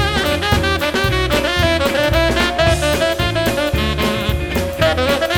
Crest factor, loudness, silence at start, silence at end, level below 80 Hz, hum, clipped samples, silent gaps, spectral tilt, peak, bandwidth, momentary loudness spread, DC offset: 16 dB; -16 LUFS; 0 s; 0 s; -26 dBFS; none; under 0.1%; none; -4.5 dB/octave; 0 dBFS; 17.5 kHz; 3 LU; under 0.1%